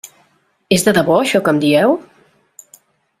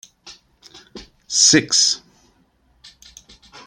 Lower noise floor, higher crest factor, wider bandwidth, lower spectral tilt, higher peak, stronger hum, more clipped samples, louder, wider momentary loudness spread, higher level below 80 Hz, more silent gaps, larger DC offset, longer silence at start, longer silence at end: about the same, -58 dBFS vs -60 dBFS; about the same, 16 dB vs 20 dB; about the same, 16 kHz vs 15.5 kHz; first, -4.5 dB/octave vs -1 dB/octave; about the same, 0 dBFS vs -2 dBFS; neither; neither; about the same, -14 LUFS vs -14 LUFS; second, 4 LU vs 10 LU; about the same, -54 dBFS vs -58 dBFS; neither; neither; first, 0.7 s vs 0.25 s; second, 1.2 s vs 1.7 s